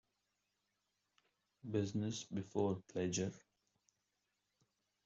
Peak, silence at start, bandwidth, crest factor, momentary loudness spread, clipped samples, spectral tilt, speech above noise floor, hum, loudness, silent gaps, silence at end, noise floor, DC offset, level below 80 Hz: -24 dBFS; 1.65 s; 8 kHz; 20 dB; 6 LU; under 0.1%; -6.5 dB/octave; 46 dB; none; -41 LUFS; none; 1.65 s; -87 dBFS; under 0.1%; -78 dBFS